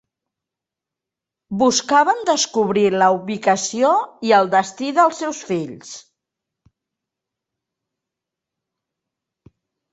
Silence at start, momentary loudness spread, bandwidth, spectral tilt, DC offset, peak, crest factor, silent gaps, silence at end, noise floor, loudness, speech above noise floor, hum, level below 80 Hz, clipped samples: 1.5 s; 13 LU; 8.4 kHz; -3.5 dB/octave; under 0.1%; -2 dBFS; 20 dB; none; 3.95 s; -86 dBFS; -17 LUFS; 69 dB; none; -66 dBFS; under 0.1%